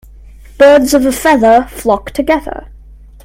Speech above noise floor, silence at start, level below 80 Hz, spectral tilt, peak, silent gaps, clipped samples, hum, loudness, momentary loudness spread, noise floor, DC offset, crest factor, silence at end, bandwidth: 26 dB; 0.6 s; -34 dBFS; -4 dB/octave; 0 dBFS; none; 0.3%; none; -10 LUFS; 9 LU; -36 dBFS; under 0.1%; 12 dB; 0.6 s; 16.5 kHz